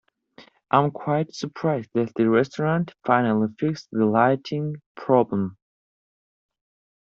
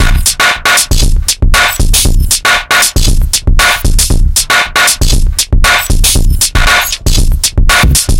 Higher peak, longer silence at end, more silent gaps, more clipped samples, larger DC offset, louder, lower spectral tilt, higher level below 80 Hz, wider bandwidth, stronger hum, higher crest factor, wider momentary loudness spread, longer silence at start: about the same, -2 dBFS vs 0 dBFS; first, 1.6 s vs 0 s; first, 4.86-4.95 s vs none; second, under 0.1% vs 0.2%; second, under 0.1% vs 1%; second, -23 LUFS vs -8 LUFS; first, -6.5 dB/octave vs -2 dB/octave; second, -66 dBFS vs -10 dBFS; second, 7.4 kHz vs 17.5 kHz; neither; first, 22 dB vs 8 dB; first, 9 LU vs 4 LU; first, 0.4 s vs 0 s